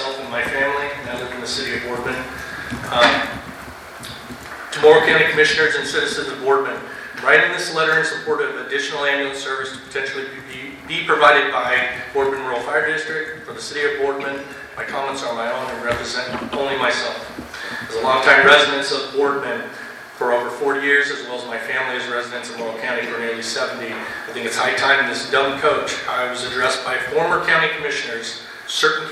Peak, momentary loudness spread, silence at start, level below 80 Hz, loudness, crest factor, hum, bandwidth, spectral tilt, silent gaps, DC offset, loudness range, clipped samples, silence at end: 0 dBFS; 15 LU; 0 s; -52 dBFS; -19 LUFS; 20 dB; none; 15 kHz; -2.5 dB/octave; none; under 0.1%; 7 LU; under 0.1%; 0 s